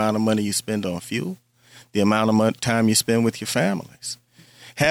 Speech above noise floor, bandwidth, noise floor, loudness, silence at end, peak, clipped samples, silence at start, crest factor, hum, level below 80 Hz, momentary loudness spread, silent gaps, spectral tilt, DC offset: 27 dB; 16.5 kHz; -48 dBFS; -22 LUFS; 0 s; -2 dBFS; under 0.1%; 0 s; 20 dB; none; -60 dBFS; 14 LU; none; -4.5 dB/octave; under 0.1%